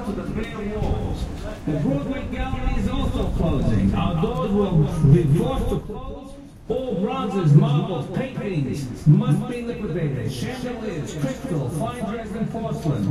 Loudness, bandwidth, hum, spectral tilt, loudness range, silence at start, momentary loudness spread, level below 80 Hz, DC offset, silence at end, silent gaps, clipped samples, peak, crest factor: -23 LUFS; 12.5 kHz; none; -8 dB/octave; 6 LU; 0 s; 12 LU; -32 dBFS; under 0.1%; 0 s; none; under 0.1%; -2 dBFS; 18 dB